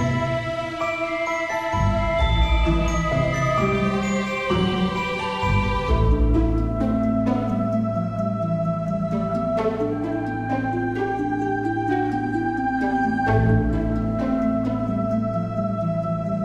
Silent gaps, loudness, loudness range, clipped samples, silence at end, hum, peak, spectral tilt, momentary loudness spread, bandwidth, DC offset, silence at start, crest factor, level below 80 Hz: none; -23 LUFS; 2 LU; under 0.1%; 0 s; none; -8 dBFS; -7 dB/octave; 4 LU; 9.6 kHz; under 0.1%; 0 s; 14 dB; -30 dBFS